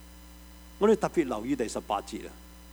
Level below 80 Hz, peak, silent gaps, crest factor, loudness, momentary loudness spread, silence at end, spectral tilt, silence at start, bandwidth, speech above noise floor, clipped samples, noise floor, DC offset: -50 dBFS; -12 dBFS; none; 18 dB; -29 LUFS; 25 LU; 0 s; -5.5 dB/octave; 0 s; over 20 kHz; 21 dB; under 0.1%; -49 dBFS; under 0.1%